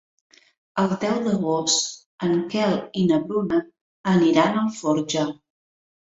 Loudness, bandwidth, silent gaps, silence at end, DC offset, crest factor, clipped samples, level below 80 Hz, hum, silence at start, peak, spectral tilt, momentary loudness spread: -22 LUFS; 8 kHz; 2.06-2.18 s, 3.81-4.04 s; 0.8 s; under 0.1%; 20 dB; under 0.1%; -62 dBFS; none; 0.75 s; -2 dBFS; -4.5 dB/octave; 10 LU